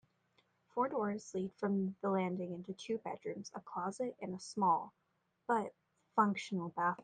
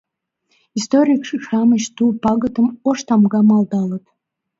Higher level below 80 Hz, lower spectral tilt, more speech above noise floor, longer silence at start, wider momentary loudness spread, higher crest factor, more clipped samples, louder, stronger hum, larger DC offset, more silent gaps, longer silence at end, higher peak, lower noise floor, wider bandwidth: second, -82 dBFS vs -56 dBFS; about the same, -6 dB/octave vs -6 dB/octave; second, 39 dB vs 52 dB; about the same, 0.75 s vs 0.75 s; first, 12 LU vs 9 LU; first, 20 dB vs 14 dB; neither; second, -38 LUFS vs -16 LUFS; neither; neither; neither; second, 0 s vs 0.6 s; second, -18 dBFS vs -2 dBFS; first, -76 dBFS vs -67 dBFS; first, 9.4 kHz vs 7.8 kHz